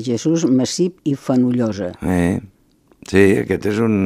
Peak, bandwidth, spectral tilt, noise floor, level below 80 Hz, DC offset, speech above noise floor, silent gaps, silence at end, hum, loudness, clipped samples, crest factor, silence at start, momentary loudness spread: 0 dBFS; 15 kHz; -6 dB/octave; -49 dBFS; -46 dBFS; under 0.1%; 32 dB; none; 0 s; none; -18 LUFS; under 0.1%; 18 dB; 0 s; 7 LU